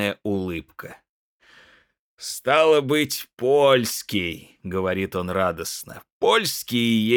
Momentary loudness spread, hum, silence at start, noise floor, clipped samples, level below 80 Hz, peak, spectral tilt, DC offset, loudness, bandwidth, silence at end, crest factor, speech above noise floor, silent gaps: 17 LU; none; 0 s; -54 dBFS; under 0.1%; -60 dBFS; -4 dBFS; -4 dB/octave; under 0.1%; -22 LUFS; over 20 kHz; 0 s; 18 dB; 32 dB; 1.09-1.40 s, 1.99-2.18 s, 6.12-6.21 s